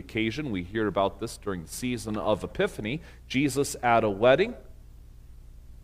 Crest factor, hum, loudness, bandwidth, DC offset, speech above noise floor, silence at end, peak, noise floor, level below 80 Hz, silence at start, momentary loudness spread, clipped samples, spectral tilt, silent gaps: 22 dB; 60 Hz at -50 dBFS; -27 LUFS; 16 kHz; under 0.1%; 21 dB; 0.05 s; -6 dBFS; -48 dBFS; -48 dBFS; 0 s; 12 LU; under 0.1%; -5 dB/octave; none